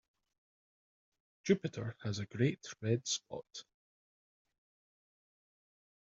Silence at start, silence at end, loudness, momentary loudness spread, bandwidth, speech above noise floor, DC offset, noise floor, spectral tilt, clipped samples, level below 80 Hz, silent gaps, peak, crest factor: 1.45 s; 2.5 s; -37 LUFS; 13 LU; 7.4 kHz; over 53 dB; under 0.1%; under -90 dBFS; -6 dB/octave; under 0.1%; -78 dBFS; none; -16 dBFS; 24 dB